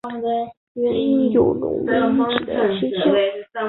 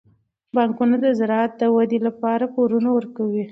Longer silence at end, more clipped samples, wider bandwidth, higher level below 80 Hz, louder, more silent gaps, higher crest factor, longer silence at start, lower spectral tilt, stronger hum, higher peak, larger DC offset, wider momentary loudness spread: about the same, 0 s vs 0 s; neither; second, 4.2 kHz vs 6 kHz; first, -52 dBFS vs -70 dBFS; about the same, -20 LUFS vs -20 LUFS; first, 0.57-0.75 s vs none; about the same, 18 dB vs 14 dB; second, 0.05 s vs 0.55 s; about the same, -9 dB/octave vs -8.5 dB/octave; neither; first, -2 dBFS vs -6 dBFS; neither; first, 7 LU vs 4 LU